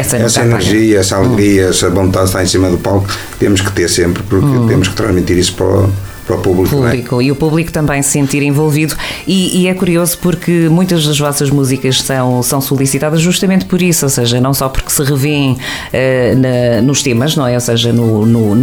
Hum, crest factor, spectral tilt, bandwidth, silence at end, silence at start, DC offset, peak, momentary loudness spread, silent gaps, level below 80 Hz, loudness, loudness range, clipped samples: none; 10 dB; -5 dB/octave; over 20 kHz; 0 s; 0 s; under 0.1%; 0 dBFS; 4 LU; none; -32 dBFS; -11 LUFS; 1 LU; under 0.1%